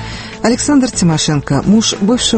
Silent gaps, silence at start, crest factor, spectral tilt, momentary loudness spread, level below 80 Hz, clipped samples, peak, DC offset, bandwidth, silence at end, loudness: none; 0 s; 12 dB; -4.5 dB/octave; 5 LU; -34 dBFS; under 0.1%; 0 dBFS; under 0.1%; 8.8 kHz; 0 s; -12 LUFS